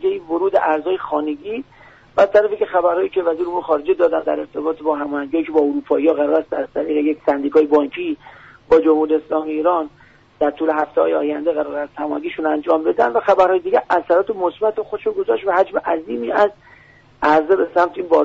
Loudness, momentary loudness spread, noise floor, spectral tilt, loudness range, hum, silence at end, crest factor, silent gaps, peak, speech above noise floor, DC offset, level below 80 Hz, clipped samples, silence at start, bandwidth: -18 LUFS; 9 LU; -48 dBFS; -3 dB/octave; 2 LU; none; 0 s; 14 dB; none; -4 dBFS; 30 dB; under 0.1%; -56 dBFS; under 0.1%; 0 s; 7.2 kHz